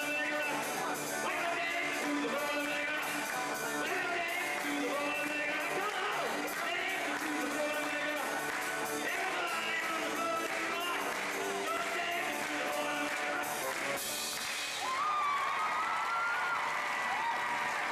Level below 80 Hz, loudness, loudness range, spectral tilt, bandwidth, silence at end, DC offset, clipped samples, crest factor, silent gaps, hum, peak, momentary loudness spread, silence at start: -74 dBFS; -33 LUFS; 1 LU; -1.5 dB/octave; 15 kHz; 0 s; under 0.1%; under 0.1%; 12 dB; none; none; -24 dBFS; 2 LU; 0 s